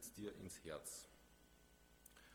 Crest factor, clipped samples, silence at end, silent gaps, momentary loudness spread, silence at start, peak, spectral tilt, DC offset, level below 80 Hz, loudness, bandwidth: 20 dB; under 0.1%; 0 s; none; 18 LU; 0 s; -36 dBFS; -3.5 dB/octave; under 0.1%; -72 dBFS; -53 LUFS; over 20 kHz